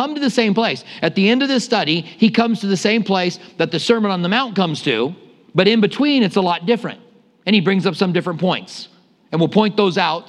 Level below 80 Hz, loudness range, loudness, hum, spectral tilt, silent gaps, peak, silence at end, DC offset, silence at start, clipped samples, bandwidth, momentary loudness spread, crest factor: -68 dBFS; 2 LU; -17 LUFS; none; -5.5 dB/octave; none; 0 dBFS; 0.05 s; under 0.1%; 0 s; under 0.1%; 11 kHz; 7 LU; 18 dB